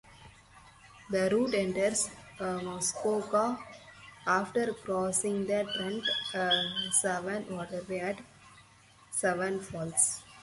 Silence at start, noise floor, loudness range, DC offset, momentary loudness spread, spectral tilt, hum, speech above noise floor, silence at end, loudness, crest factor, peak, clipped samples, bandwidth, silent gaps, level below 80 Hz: 0.05 s; -59 dBFS; 3 LU; under 0.1%; 10 LU; -2.5 dB/octave; none; 28 dB; 0 s; -31 LUFS; 22 dB; -10 dBFS; under 0.1%; 12 kHz; none; -66 dBFS